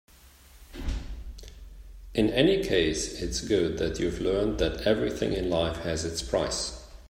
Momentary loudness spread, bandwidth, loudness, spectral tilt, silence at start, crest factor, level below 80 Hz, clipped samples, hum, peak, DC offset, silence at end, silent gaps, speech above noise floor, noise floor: 17 LU; 16 kHz; -28 LUFS; -4.5 dB/octave; 0.25 s; 20 dB; -40 dBFS; under 0.1%; none; -8 dBFS; under 0.1%; 0 s; none; 27 dB; -53 dBFS